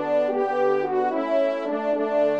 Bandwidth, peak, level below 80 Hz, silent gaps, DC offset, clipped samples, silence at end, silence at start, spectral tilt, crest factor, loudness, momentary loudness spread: 7.4 kHz; -10 dBFS; -78 dBFS; none; 0.1%; under 0.1%; 0 s; 0 s; -6.5 dB/octave; 12 dB; -23 LUFS; 2 LU